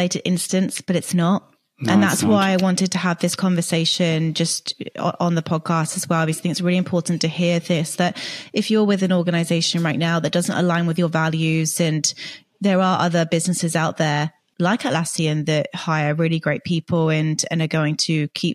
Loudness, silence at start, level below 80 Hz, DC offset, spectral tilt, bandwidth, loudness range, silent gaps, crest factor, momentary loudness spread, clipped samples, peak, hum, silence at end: -20 LUFS; 0 s; -64 dBFS; under 0.1%; -5 dB/octave; 14.5 kHz; 2 LU; none; 16 dB; 5 LU; under 0.1%; -4 dBFS; none; 0 s